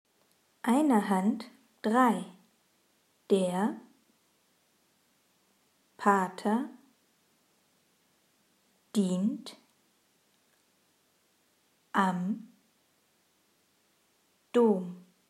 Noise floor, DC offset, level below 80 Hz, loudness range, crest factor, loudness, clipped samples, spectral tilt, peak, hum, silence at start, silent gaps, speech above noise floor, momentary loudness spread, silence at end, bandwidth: -71 dBFS; under 0.1%; under -90 dBFS; 7 LU; 24 dB; -29 LUFS; under 0.1%; -6.5 dB/octave; -10 dBFS; none; 0.65 s; none; 43 dB; 16 LU; 0.3 s; 14.5 kHz